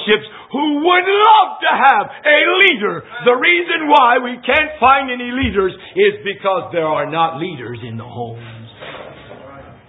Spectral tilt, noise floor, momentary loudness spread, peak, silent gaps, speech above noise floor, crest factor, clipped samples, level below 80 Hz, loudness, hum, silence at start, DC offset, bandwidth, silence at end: -6.5 dB/octave; -37 dBFS; 18 LU; 0 dBFS; none; 23 dB; 16 dB; under 0.1%; -44 dBFS; -13 LUFS; none; 0 s; under 0.1%; 6.6 kHz; 0.2 s